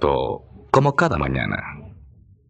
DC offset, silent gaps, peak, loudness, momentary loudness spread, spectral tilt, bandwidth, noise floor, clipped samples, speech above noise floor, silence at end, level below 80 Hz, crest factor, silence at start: under 0.1%; none; 0 dBFS; -21 LUFS; 16 LU; -7 dB/octave; 8.6 kHz; -49 dBFS; under 0.1%; 29 dB; 0.55 s; -40 dBFS; 22 dB; 0 s